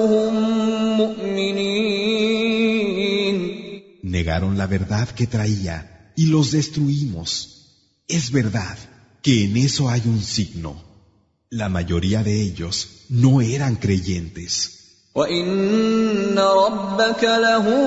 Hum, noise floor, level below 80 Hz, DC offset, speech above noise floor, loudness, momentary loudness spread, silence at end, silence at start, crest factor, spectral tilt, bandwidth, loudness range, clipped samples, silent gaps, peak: none; -59 dBFS; -44 dBFS; under 0.1%; 40 dB; -20 LUFS; 11 LU; 0 s; 0 s; 16 dB; -5.5 dB/octave; 8 kHz; 3 LU; under 0.1%; none; -4 dBFS